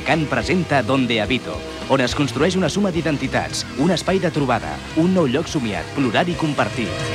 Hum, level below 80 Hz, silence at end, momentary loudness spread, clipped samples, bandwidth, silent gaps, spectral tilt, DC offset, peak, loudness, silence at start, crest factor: none; -40 dBFS; 0 s; 5 LU; under 0.1%; 14 kHz; none; -5.5 dB/octave; under 0.1%; -4 dBFS; -20 LUFS; 0 s; 16 dB